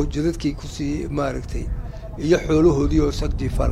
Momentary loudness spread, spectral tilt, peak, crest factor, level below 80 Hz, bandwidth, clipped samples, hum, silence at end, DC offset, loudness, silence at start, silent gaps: 13 LU; -7 dB/octave; -4 dBFS; 16 dB; -28 dBFS; 13 kHz; under 0.1%; none; 0 s; under 0.1%; -22 LUFS; 0 s; none